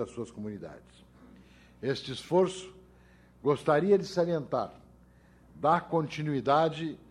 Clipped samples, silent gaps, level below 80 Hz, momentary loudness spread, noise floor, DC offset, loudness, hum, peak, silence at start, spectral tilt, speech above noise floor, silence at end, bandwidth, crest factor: under 0.1%; none; -62 dBFS; 15 LU; -58 dBFS; under 0.1%; -30 LUFS; none; -12 dBFS; 0 s; -6.5 dB/octave; 29 dB; 0.15 s; 12 kHz; 20 dB